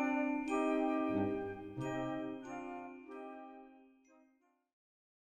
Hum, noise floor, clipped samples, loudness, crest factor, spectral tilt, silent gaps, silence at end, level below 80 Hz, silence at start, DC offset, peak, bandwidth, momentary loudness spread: none; -74 dBFS; under 0.1%; -38 LUFS; 16 dB; -7 dB/octave; none; 1.5 s; -68 dBFS; 0 s; under 0.1%; -22 dBFS; 9 kHz; 16 LU